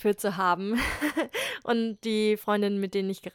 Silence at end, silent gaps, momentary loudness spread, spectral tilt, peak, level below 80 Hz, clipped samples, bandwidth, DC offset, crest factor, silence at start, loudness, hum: 0.05 s; none; 4 LU; -5 dB/octave; -12 dBFS; -50 dBFS; under 0.1%; 18 kHz; under 0.1%; 16 dB; 0 s; -28 LUFS; none